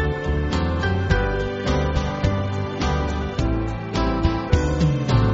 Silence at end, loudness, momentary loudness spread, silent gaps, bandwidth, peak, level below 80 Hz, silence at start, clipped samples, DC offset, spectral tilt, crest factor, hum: 0 s; -22 LUFS; 4 LU; none; 7.8 kHz; -2 dBFS; -28 dBFS; 0 s; under 0.1%; under 0.1%; -6 dB/octave; 18 dB; none